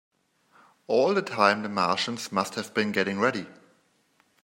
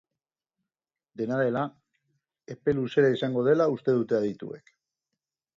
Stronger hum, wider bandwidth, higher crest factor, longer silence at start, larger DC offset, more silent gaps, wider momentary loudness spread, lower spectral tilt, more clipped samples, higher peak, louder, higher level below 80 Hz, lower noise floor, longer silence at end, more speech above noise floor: neither; first, 16 kHz vs 7.4 kHz; first, 24 dB vs 18 dB; second, 0.9 s vs 1.2 s; neither; neither; second, 6 LU vs 16 LU; second, -4.5 dB/octave vs -8 dB/octave; neither; first, -4 dBFS vs -10 dBFS; about the same, -26 LUFS vs -26 LUFS; second, -74 dBFS vs -66 dBFS; second, -67 dBFS vs under -90 dBFS; about the same, 0.9 s vs 1 s; second, 41 dB vs over 64 dB